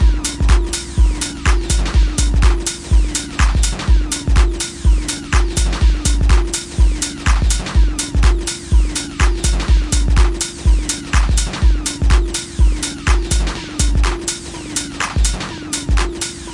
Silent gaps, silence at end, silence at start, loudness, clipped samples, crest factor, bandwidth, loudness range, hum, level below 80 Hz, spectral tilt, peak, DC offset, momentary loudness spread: none; 0 s; 0 s; -17 LUFS; under 0.1%; 12 dB; 11.5 kHz; 2 LU; none; -16 dBFS; -4 dB/octave; -2 dBFS; under 0.1%; 5 LU